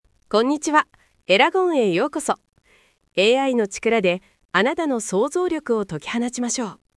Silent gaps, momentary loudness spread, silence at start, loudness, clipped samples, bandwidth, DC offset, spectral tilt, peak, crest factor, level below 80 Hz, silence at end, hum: 4.45-4.49 s; 9 LU; 0.3 s; -21 LUFS; under 0.1%; 12 kHz; under 0.1%; -3.5 dB/octave; -2 dBFS; 20 dB; -62 dBFS; 0.2 s; none